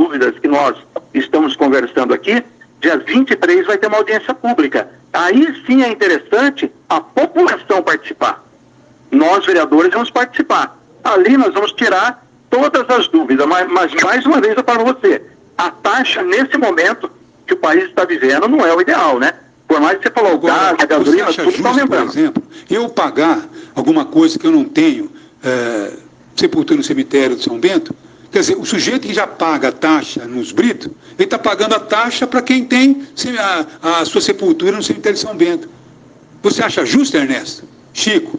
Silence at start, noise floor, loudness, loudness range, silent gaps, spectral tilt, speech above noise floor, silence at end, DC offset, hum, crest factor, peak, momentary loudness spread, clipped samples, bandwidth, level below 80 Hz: 0 s; -46 dBFS; -13 LUFS; 3 LU; none; -3.5 dB/octave; 33 dB; 0 s; under 0.1%; none; 14 dB; 0 dBFS; 8 LU; under 0.1%; 9.6 kHz; -60 dBFS